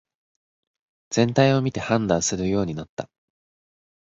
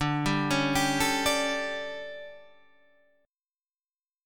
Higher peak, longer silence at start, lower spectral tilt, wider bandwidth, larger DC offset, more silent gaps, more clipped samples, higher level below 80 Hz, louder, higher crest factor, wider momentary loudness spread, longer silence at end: first, -4 dBFS vs -12 dBFS; first, 1.1 s vs 0 s; about the same, -5 dB/octave vs -4 dB/octave; second, 8.2 kHz vs 18 kHz; neither; about the same, 2.89-2.97 s vs 3.28-3.33 s; neither; about the same, -52 dBFS vs -52 dBFS; first, -22 LUFS vs -27 LUFS; about the same, 22 dB vs 18 dB; about the same, 16 LU vs 16 LU; first, 1.1 s vs 0 s